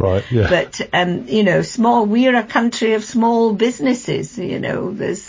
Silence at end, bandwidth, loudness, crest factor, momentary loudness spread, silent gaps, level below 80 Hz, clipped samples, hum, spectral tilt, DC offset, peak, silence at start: 0 s; 7.6 kHz; -17 LUFS; 14 dB; 8 LU; none; -40 dBFS; under 0.1%; none; -5.5 dB/octave; under 0.1%; -4 dBFS; 0 s